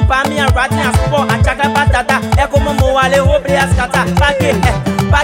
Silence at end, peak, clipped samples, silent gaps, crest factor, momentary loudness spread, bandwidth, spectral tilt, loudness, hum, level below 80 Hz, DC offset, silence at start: 0 s; 0 dBFS; under 0.1%; none; 12 dB; 2 LU; 16.5 kHz; -5.5 dB/octave; -12 LUFS; none; -20 dBFS; under 0.1%; 0 s